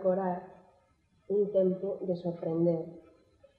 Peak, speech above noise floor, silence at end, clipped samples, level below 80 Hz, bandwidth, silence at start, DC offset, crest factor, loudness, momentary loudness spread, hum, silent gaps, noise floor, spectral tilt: -16 dBFS; 38 dB; 0.6 s; under 0.1%; -74 dBFS; 4.9 kHz; 0 s; under 0.1%; 16 dB; -31 LUFS; 8 LU; none; none; -69 dBFS; -11.5 dB/octave